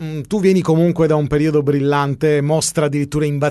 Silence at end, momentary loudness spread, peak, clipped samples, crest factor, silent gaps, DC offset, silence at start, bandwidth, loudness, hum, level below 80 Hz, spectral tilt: 0 s; 4 LU; -4 dBFS; under 0.1%; 12 dB; none; under 0.1%; 0 s; 12.5 kHz; -16 LUFS; none; -44 dBFS; -6 dB/octave